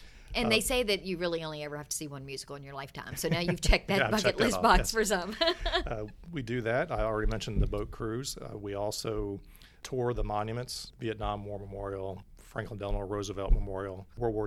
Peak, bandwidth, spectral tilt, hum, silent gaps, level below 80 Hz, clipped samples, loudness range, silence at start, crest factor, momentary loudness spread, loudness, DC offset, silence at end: -10 dBFS; 15.5 kHz; -4 dB/octave; none; none; -38 dBFS; under 0.1%; 8 LU; 0 s; 22 dB; 14 LU; -32 LUFS; under 0.1%; 0 s